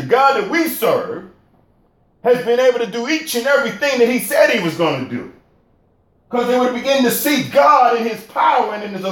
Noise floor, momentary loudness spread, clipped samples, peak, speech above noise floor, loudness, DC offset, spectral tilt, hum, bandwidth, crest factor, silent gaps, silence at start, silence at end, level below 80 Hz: -57 dBFS; 9 LU; under 0.1%; 0 dBFS; 42 dB; -16 LUFS; under 0.1%; -4 dB/octave; none; 17 kHz; 16 dB; none; 0 s; 0 s; -62 dBFS